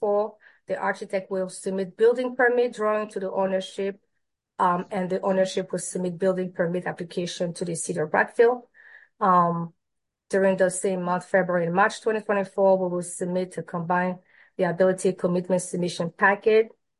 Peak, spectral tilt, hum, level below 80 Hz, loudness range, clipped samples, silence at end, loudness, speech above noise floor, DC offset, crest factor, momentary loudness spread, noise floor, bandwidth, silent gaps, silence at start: -6 dBFS; -5.5 dB/octave; none; -74 dBFS; 3 LU; under 0.1%; 0.3 s; -25 LUFS; 58 dB; under 0.1%; 18 dB; 9 LU; -82 dBFS; 11.5 kHz; none; 0 s